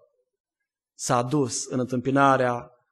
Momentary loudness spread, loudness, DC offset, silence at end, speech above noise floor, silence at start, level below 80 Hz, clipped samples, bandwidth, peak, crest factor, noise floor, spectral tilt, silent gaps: 9 LU; -24 LUFS; under 0.1%; 0.25 s; 64 dB; 1 s; -66 dBFS; under 0.1%; 12 kHz; -6 dBFS; 20 dB; -87 dBFS; -5 dB/octave; none